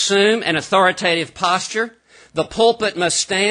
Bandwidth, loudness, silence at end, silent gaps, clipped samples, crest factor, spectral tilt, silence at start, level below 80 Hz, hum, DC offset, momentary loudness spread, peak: 10.5 kHz; -17 LUFS; 0 s; none; under 0.1%; 16 dB; -2.5 dB/octave; 0 s; -54 dBFS; none; under 0.1%; 9 LU; -2 dBFS